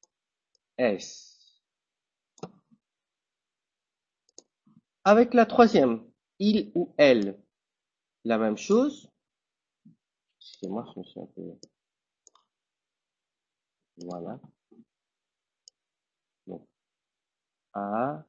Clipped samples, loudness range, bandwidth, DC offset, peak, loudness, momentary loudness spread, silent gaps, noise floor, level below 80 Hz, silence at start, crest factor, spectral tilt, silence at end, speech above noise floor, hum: under 0.1%; 24 LU; 7.6 kHz; under 0.1%; -4 dBFS; -24 LUFS; 26 LU; none; -90 dBFS; -70 dBFS; 0.8 s; 26 dB; -6 dB/octave; 0.05 s; 65 dB; none